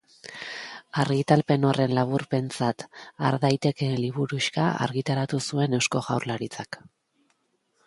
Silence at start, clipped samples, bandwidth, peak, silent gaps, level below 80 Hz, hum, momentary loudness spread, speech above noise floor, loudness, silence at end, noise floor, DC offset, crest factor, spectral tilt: 0.25 s; under 0.1%; 11.5 kHz; -4 dBFS; none; -64 dBFS; none; 15 LU; 46 dB; -26 LUFS; 1.1 s; -71 dBFS; under 0.1%; 22 dB; -5.5 dB/octave